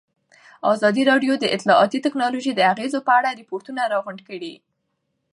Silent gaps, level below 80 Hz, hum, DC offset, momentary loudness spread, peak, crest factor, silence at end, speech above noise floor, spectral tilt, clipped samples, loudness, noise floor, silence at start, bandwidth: none; -76 dBFS; none; under 0.1%; 16 LU; -4 dBFS; 18 dB; 0.8 s; 54 dB; -4.5 dB/octave; under 0.1%; -20 LUFS; -74 dBFS; 0.65 s; 11 kHz